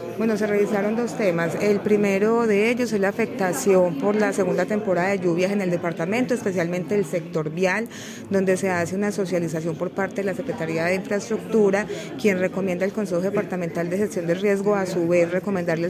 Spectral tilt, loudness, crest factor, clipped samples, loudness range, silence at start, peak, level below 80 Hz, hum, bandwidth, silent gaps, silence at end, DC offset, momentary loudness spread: -6 dB/octave; -23 LUFS; 16 dB; under 0.1%; 4 LU; 0 s; -8 dBFS; -60 dBFS; none; 15.5 kHz; none; 0 s; under 0.1%; 6 LU